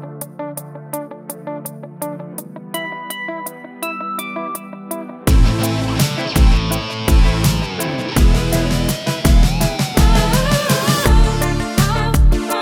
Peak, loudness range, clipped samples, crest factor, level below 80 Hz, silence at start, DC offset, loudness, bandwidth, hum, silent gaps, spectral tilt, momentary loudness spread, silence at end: 0 dBFS; 12 LU; under 0.1%; 16 dB; -18 dBFS; 0 s; under 0.1%; -17 LUFS; 19 kHz; none; none; -5 dB/octave; 14 LU; 0 s